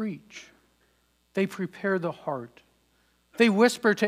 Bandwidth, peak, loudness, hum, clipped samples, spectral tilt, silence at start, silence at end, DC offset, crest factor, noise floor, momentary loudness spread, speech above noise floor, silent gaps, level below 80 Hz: 16 kHz; -8 dBFS; -26 LUFS; none; under 0.1%; -5 dB/octave; 0 s; 0 s; under 0.1%; 20 dB; -68 dBFS; 24 LU; 42 dB; none; -74 dBFS